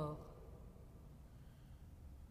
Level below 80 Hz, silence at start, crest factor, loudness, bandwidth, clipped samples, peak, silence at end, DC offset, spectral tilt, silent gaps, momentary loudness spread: -60 dBFS; 0 s; 22 dB; -57 LUFS; 15 kHz; under 0.1%; -32 dBFS; 0 s; under 0.1%; -8 dB/octave; none; 7 LU